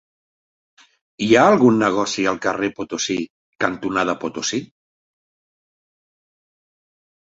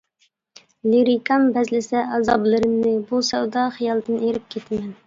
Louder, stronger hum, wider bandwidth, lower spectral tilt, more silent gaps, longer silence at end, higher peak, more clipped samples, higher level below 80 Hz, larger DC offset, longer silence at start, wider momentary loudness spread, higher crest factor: about the same, -19 LUFS vs -20 LUFS; neither; about the same, 8 kHz vs 7.6 kHz; about the same, -4.5 dB/octave vs -5 dB/octave; first, 3.30-3.53 s vs none; first, 2.55 s vs 0.15 s; about the same, -2 dBFS vs -4 dBFS; neither; about the same, -60 dBFS vs -58 dBFS; neither; first, 1.2 s vs 0.85 s; first, 12 LU vs 9 LU; about the same, 20 dB vs 16 dB